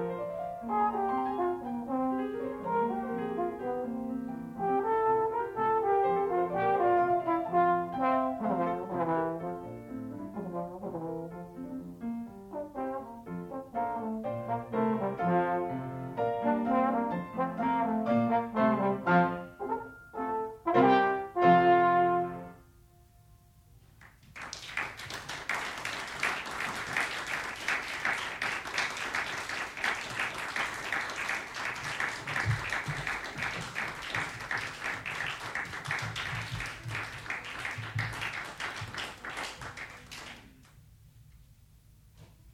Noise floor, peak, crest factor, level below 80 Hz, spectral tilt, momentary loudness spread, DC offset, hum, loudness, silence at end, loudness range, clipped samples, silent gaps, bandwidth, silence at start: -59 dBFS; -10 dBFS; 22 dB; -60 dBFS; -5 dB/octave; 13 LU; under 0.1%; none; -32 LUFS; 0 s; 12 LU; under 0.1%; none; 16 kHz; 0 s